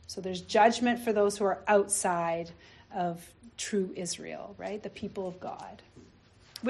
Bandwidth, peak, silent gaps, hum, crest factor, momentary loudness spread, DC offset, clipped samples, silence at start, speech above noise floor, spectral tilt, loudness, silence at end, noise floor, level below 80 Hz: 12.5 kHz; -10 dBFS; none; none; 22 dB; 19 LU; under 0.1%; under 0.1%; 0.1 s; 28 dB; -3.5 dB/octave; -30 LUFS; 0 s; -59 dBFS; -64 dBFS